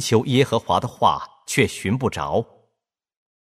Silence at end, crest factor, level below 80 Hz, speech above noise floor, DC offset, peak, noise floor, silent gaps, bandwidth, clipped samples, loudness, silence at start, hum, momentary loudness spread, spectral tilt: 1.05 s; 18 dB; -52 dBFS; 59 dB; under 0.1%; -4 dBFS; -80 dBFS; none; 15 kHz; under 0.1%; -21 LUFS; 0 s; none; 7 LU; -5 dB/octave